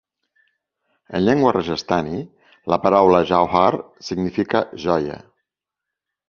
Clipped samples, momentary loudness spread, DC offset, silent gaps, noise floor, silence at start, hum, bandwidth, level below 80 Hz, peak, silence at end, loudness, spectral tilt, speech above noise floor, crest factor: under 0.1%; 15 LU; under 0.1%; none; -84 dBFS; 1.1 s; none; 7 kHz; -50 dBFS; 0 dBFS; 1.1 s; -19 LUFS; -6.5 dB/octave; 66 dB; 20 dB